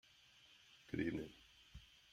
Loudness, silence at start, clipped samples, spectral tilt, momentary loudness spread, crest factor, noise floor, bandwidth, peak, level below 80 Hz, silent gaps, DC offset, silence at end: -46 LUFS; 0.35 s; under 0.1%; -6.5 dB/octave; 22 LU; 22 dB; -68 dBFS; 15.5 kHz; -28 dBFS; -68 dBFS; none; under 0.1%; 0.15 s